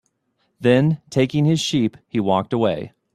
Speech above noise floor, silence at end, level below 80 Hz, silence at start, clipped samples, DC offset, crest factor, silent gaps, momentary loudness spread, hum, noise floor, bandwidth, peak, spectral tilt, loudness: 50 dB; 0.25 s; -56 dBFS; 0.6 s; under 0.1%; under 0.1%; 18 dB; none; 6 LU; none; -69 dBFS; 12.5 kHz; -2 dBFS; -6.5 dB/octave; -20 LUFS